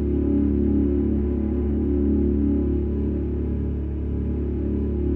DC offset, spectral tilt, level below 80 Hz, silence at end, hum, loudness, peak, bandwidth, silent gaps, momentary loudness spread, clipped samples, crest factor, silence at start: under 0.1%; -13 dB/octave; -26 dBFS; 0 s; none; -23 LUFS; -10 dBFS; 3.1 kHz; none; 5 LU; under 0.1%; 12 dB; 0 s